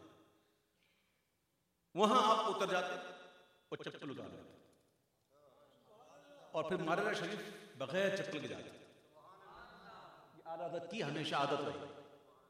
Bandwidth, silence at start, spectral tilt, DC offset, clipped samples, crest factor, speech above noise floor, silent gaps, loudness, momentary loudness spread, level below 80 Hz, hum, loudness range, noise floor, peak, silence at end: 15 kHz; 0 s; -4.5 dB/octave; under 0.1%; under 0.1%; 26 dB; 44 dB; none; -38 LUFS; 24 LU; -84 dBFS; none; 11 LU; -82 dBFS; -14 dBFS; 0.35 s